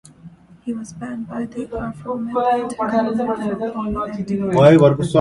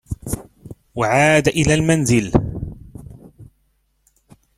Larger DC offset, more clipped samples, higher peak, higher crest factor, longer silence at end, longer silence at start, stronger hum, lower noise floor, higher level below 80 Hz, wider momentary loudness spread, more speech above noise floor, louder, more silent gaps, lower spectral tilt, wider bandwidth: neither; neither; about the same, 0 dBFS vs 0 dBFS; about the same, 18 dB vs 20 dB; second, 0 s vs 1.15 s; first, 0.25 s vs 0.1 s; neither; second, -43 dBFS vs -64 dBFS; second, -46 dBFS vs -38 dBFS; second, 17 LU vs 21 LU; second, 25 dB vs 49 dB; about the same, -19 LUFS vs -17 LUFS; neither; first, -7.5 dB/octave vs -5 dB/octave; second, 11.5 kHz vs 15 kHz